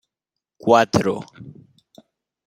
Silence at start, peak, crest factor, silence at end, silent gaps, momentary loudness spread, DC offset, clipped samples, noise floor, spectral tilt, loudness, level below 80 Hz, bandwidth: 0.65 s; -2 dBFS; 22 dB; 0.95 s; none; 16 LU; under 0.1%; under 0.1%; -85 dBFS; -5.5 dB/octave; -19 LUFS; -58 dBFS; 16 kHz